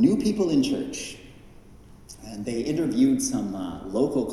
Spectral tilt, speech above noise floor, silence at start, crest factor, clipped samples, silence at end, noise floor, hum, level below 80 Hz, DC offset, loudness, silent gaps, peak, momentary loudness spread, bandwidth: -5.5 dB/octave; 23 dB; 0 s; 18 dB; under 0.1%; 0 s; -48 dBFS; none; -50 dBFS; under 0.1%; -25 LUFS; none; -8 dBFS; 17 LU; 13 kHz